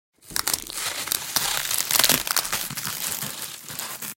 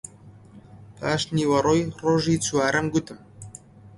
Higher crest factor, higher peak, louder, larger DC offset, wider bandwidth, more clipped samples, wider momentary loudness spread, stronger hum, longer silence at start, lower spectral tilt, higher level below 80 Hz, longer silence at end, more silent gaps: first, 26 dB vs 18 dB; first, 0 dBFS vs -8 dBFS; about the same, -23 LUFS vs -23 LUFS; neither; first, 17.5 kHz vs 11.5 kHz; neither; second, 13 LU vs 22 LU; neither; first, 0.25 s vs 0.05 s; second, 0 dB/octave vs -5 dB/octave; about the same, -56 dBFS vs -54 dBFS; about the same, 0 s vs 0.1 s; neither